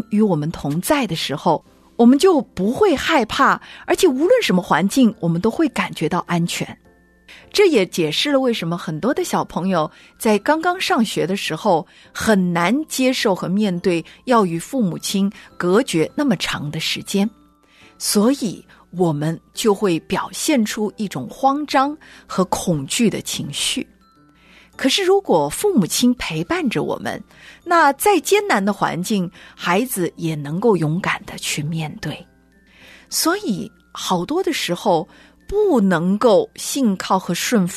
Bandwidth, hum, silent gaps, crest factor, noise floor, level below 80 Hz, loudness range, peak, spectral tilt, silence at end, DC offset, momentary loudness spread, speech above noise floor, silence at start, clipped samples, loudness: 14 kHz; none; none; 16 dB; -52 dBFS; -50 dBFS; 5 LU; -4 dBFS; -4.5 dB/octave; 0 s; under 0.1%; 9 LU; 34 dB; 0.1 s; under 0.1%; -19 LUFS